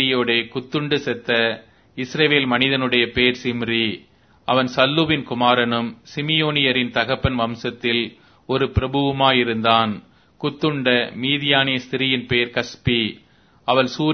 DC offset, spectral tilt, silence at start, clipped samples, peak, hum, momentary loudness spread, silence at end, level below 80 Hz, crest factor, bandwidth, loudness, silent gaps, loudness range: under 0.1%; -5.5 dB/octave; 0 s; under 0.1%; 0 dBFS; none; 9 LU; 0 s; -44 dBFS; 20 dB; 6.6 kHz; -19 LUFS; none; 2 LU